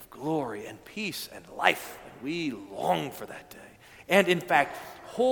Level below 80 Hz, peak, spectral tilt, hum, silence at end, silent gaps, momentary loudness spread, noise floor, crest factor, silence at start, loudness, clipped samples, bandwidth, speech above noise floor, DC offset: -66 dBFS; -4 dBFS; -4.5 dB/octave; none; 0 s; none; 19 LU; -51 dBFS; 26 dB; 0 s; -28 LUFS; under 0.1%; 19 kHz; 23 dB; under 0.1%